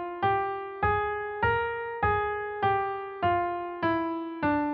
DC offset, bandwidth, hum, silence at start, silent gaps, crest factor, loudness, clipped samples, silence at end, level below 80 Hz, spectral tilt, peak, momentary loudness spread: under 0.1%; 5.6 kHz; none; 0 s; none; 16 dB; -29 LUFS; under 0.1%; 0 s; -48 dBFS; -4.5 dB/octave; -12 dBFS; 5 LU